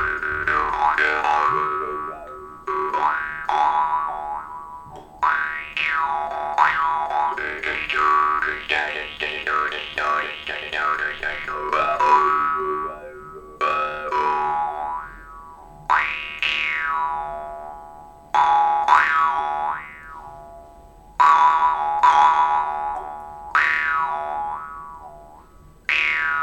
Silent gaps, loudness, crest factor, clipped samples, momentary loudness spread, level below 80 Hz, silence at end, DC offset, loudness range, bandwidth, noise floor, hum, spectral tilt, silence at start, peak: none; -21 LUFS; 20 dB; under 0.1%; 19 LU; -50 dBFS; 0 s; under 0.1%; 5 LU; 10.5 kHz; -48 dBFS; none; -3 dB/octave; 0 s; -2 dBFS